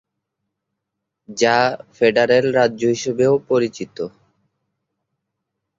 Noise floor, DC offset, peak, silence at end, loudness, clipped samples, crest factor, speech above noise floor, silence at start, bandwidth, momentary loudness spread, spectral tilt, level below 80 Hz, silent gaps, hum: -80 dBFS; under 0.1%; -2 dBFS; 1.7 s; -17 LUFS; under 0.1%; 18 dB; 62 dB; 1.3 s; 7.8 kHz; 14 LU; -4.5 dB/octave; -62 dBFS; none; none